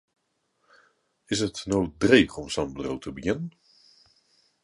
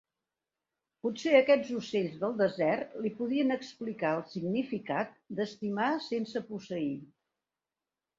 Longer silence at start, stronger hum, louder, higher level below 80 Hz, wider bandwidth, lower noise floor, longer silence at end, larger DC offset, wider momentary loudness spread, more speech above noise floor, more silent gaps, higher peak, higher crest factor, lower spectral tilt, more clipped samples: first, 1.3 s vs 1.05 s; neither; first, -26 LUFS vs -32 LUFS; first, -52 dBFS vs -76 dBFS; first, 11.5 kHz vs 7.6 kHz; second, -73 dBFS vs under -90 dBFS; about the same, 1.15 s vs 1.15 s; neither; about the same, 13 LU vs 11 LU; second, 48 dB vs over 59 dB; neither; first, -2 dBFS vs -10 dBFS; about the same, 26 dB vs 22 dB; second, -4.5 dB/octave vs -6 dB/octave; neither